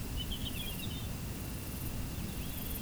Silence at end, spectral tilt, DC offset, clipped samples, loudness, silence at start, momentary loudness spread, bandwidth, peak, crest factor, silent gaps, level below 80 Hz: 0 s; -4 dB/octave; under 0.1%; under 0.1%; -39 LUFS; 0 s; 3 LU; over 20 kHz; -26 dBFS; 14 dB; none; -44 dBFS